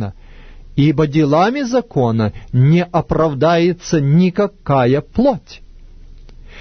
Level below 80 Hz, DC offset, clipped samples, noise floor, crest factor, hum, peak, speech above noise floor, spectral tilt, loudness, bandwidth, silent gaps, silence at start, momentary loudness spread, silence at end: -38 dBFS; under 0.1%; under 0.1%; -37 dBFS; 14 dB; none; -2 dBFS; 23 dB; -7.5 dB/octave; -15 LUFS; 6.6 kHz; none; 0 s; 6 LU; 0 s